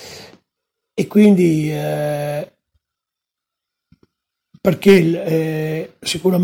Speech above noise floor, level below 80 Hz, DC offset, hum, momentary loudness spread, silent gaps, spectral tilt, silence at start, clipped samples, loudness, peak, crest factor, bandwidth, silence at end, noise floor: 69 dB; -56 dBFS; under 0.1%; none; 16 LU; none; -6.5 dB/octave; 0 s; under 0.1%; -16 LUFS; 0 dBFS; 18 dB; 17 kHz; 0 s; -84 dBFS